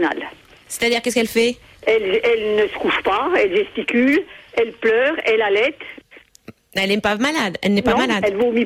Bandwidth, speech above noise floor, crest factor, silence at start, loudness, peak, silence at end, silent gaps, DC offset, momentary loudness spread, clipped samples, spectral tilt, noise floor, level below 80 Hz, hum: 16 kHz; 27 dB; 14 dB; 0 s; -18 LUFS; -6 dBFS; 0 s; none; under 0.1%; 7 LU; under 0.1%; -4 dB/octave; -45 dBFS; -50 dBFS; none